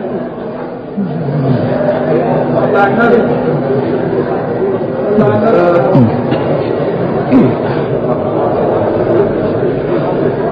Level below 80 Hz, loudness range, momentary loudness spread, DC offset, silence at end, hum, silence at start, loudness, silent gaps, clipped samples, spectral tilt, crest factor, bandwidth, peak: -40 dBFS; 1 LU; 6 LU; under 0.1%; 0 s; none; 0 s; -12 LUFS; none; under 0.1%; -10.5 dB/octave; 12 dB; 5.2 kHz; 0 dBFS